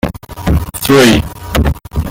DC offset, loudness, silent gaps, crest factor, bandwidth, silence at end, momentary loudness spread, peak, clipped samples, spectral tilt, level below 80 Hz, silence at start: under 0.1%; -12 LUFS; none; 12 dB; 17.5 kHz; 0 s; 13 LU; 0 dBFS; under 0.1%; -5 dB/octave; -22 dBFS; 0.05 s